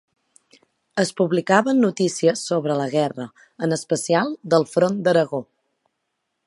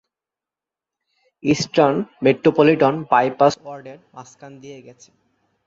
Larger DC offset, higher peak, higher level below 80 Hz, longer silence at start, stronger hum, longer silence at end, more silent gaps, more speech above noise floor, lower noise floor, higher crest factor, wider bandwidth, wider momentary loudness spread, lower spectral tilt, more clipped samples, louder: neither; about the same, -2 dBFS vs -2 dBFS; second, -72 dBFS vs -60 dBFS; second, 0.95 s vs 1.45 s; neither; first, 1.05 s vs 0.75 s; neither; second, 56 dB vs 70 dB; second, -76 dBFS vs -88 dBFS; about the same, 20 dB vs 20 dB; first, 11.5 kHz vs 7.8 kHz; second, 9 LU vs 24 LU; about the same, -5 dB/octave vs -6 dB/octave; neither; second, -21 LUFS vs -17 LUFS